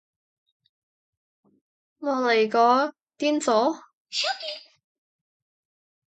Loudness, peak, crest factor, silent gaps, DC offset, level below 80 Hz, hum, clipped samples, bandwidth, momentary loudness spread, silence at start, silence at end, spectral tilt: -24 LUFS; -6 dBFS; 20 dB; 3.95-4.05 s; under 0.1%; -82 dBFS; none; under 0.1%; 9.2 kHz; 14 LU; 2 s; 1.55 s; -2.5 dB/octave